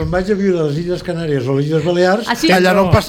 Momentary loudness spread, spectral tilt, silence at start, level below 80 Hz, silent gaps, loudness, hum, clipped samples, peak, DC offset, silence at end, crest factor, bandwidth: 8 LU; -6 dB/octave; 0 s; -36 dBFS; none; -15 LUFS; none; under 0.1%; -2 dBFS; under 0.1%; 0 s; 14 dB; 17 kHz